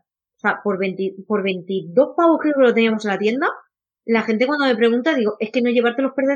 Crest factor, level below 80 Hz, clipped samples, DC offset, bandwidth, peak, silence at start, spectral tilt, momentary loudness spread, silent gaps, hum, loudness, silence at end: 16 dB; -80 dBFS; under 0.1%; under 0.1%; 8.6 kHz; -4 dBFS; 0.45 s; -6.5 dB/octave; 8 LU; none; none; -19 LUFS; 0 s